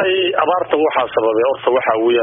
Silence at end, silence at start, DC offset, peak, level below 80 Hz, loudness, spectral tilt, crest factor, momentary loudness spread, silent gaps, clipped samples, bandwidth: 0 s; 0 s; under 0.1%; -2 dBFS; -60 dBFS; -16 LUFS; -1.5 dB/octave; 14 dB; 1 LU; none; under 0.1%; 3.8 kHz